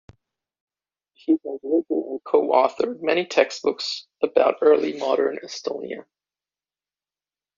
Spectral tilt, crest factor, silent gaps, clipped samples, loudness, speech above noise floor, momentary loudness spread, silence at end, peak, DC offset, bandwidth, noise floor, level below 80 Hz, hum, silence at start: -2 dB/octave; 20 dB; none; under 0.1%; -22 LUFS; over 68 dB; 12 LU; 1.55 s; -4 dBFS; under 0.1%; 7.4 kHz; under -90 dBFS; -70 dBFS; 50 Hz at -70 dBFS; 1.3 s